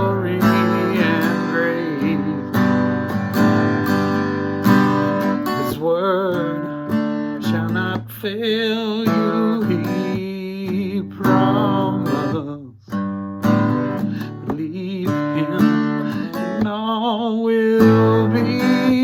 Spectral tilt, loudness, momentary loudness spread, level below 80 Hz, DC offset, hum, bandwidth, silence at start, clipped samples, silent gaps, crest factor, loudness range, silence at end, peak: -7 dB/octave; -19 LUFS; 9 LU; -54 dBFS; under 0.1%; none; 18 kHz; 0 s; under 0.1%; none; 18 dB; 4 LU; 0 s; 0 dBFS